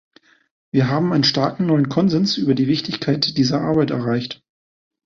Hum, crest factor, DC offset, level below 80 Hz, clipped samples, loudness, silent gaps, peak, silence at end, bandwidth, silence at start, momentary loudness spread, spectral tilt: none; 16 dB; under 0.1%; -54 dBFS; under 0.1%; -19 LUFS; none; -4 dBFS; 0.7 s; 7.4 kHz; 0.75 s; 6 LU; -6 dB/octave